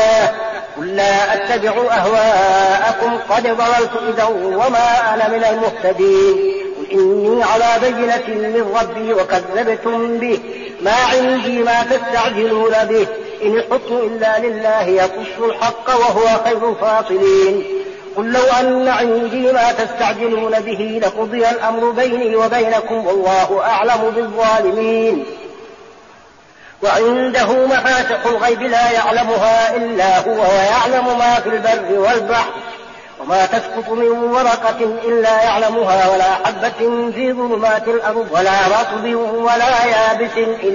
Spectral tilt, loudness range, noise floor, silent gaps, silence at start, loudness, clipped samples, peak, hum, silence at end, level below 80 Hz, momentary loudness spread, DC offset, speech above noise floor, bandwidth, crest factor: -2 dB/octave; 3 LU; -43 dBFS; none; 0 s; -15 LUFS; under 0.1%; -2 dBFS; none; 0 s; -50 dBFS; 6 LU; under 0.1%; 29 dB; 7.4 kHz; 12 dB